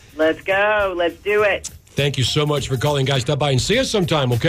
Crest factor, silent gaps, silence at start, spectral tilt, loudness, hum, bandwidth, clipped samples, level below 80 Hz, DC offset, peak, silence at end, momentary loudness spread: 12 dB; none; 0.15 s; -4.5 dB/octave; -19 LUFS; none; 15.5 kHz; under 0.1%; -42 dBFS; under 0.1%; -8 dBFS; 0 s; 4 LU